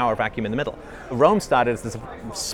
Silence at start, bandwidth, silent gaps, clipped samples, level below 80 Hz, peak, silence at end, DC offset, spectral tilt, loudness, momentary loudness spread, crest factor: 0 s; 18 kHz; none; under 0.1%; -46 dBFS; -2 dBFS; 0 s; under 0.1%; -4.5 dB/octave; -22 LUFS; 15 LU; 20 dB